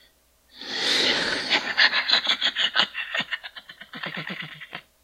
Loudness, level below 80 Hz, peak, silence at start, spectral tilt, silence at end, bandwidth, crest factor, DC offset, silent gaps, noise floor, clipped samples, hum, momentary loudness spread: -22 LUFS; -64 dBFS; -2 dBFS; 0.55 s; -1 dB/octave; 0.25 s; 16 kHz; 24 dB; under 0.1%; none; -60 dBFS; under 0.1%; none; 20 LU